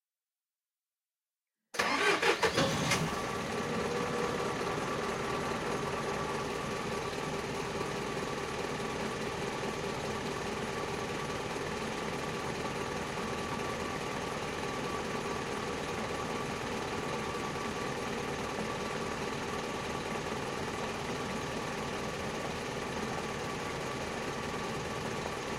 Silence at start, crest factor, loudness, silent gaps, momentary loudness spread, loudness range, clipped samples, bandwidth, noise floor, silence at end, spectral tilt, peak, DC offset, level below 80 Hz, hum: 1.75 s; 22 dB; -35 LUFS; none; 5 LU; 5 LU; under 0.1%; 16 kHz; under -90 dBFS; 0 s; -4 dB/octave; -14 dBFS; under 0.1%; -56 dBFS; none